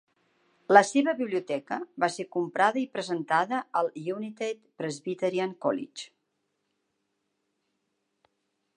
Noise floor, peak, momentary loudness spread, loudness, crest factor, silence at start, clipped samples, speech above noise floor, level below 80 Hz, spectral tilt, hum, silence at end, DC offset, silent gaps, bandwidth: -79 dBFS; -2 dBFS; 14 LU; -28 LUFS; 26 dB; 0.7 s; under 0.1%; 51 dB; -84 dBFS; -4.5 dB/octave; none; 2.7 s; under 0.1%; none; 11 kHz